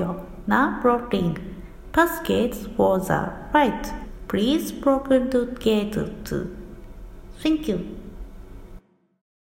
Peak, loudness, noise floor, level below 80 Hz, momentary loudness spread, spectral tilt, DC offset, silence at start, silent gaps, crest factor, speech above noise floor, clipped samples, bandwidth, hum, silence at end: -4 dBFS; -23 LUFS; -46 dBFS; -40 dBFS; 19 LU; -6 dB/octave; under 0.1%; 0 s; none; 20 dB; 24 dB; under 0.1%; 16.5 kHz; none; 0.8 s